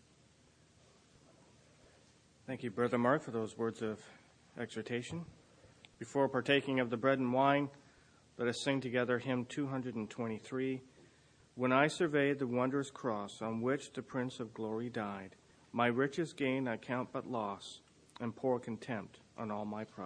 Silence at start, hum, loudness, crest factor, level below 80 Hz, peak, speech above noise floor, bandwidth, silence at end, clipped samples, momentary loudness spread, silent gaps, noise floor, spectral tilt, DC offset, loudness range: 2.45 s; none; -36 LUFS; 24 dB; -76 dBFS; -14 dBFS; 31 dB; 10 kHz; 0 s; under 0.1%; 14 LU; none; -67 dBFS; -6 dB/octave; under 0.1%; 5 LU